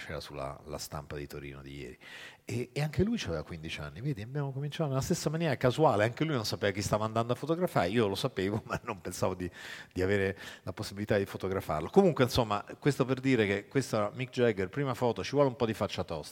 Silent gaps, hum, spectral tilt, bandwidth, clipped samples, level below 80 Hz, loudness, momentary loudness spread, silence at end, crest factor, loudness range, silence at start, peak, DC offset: none; none; -6 dB/octave; 18 kHz; under 0.1%; -56 dBFS; -32 LUFS; 13 LU; 0 s; 24 dB; 7 LU; 0 s; -8 dBFS; under 0.1%